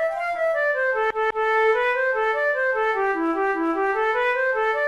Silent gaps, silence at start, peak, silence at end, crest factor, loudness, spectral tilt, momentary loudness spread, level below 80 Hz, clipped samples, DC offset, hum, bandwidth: none; 0 s; -12 dBFS; 0 s; 10 dB; -22 LUFS; -4 dB/octave; 3 LU; -56 dBFS; under 0.1%; 0.1%; none; 12 kHz